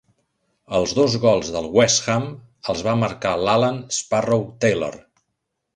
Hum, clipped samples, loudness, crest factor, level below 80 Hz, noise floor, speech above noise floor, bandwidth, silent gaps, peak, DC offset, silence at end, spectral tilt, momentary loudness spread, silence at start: none; under 0.1%; -20 LUFS; 20 dB; -50 dBFS; -77 dBFS; 57 dB; 11 kHz; none; -2 dBFS; under 0.1%; 0.8 s; -4 dB/octave; 9 LU; 0.7 s